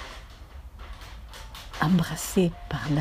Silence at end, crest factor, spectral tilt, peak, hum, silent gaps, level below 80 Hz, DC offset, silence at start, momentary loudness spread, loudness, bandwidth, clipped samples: 0 s; 20 dB; -5.5 dB/octave; -8 dBFS; none; none; -44 dBFS; under 0.1%; 0 s; 21 LU; -26 LUFS; 15.5 kHz; under 0.1%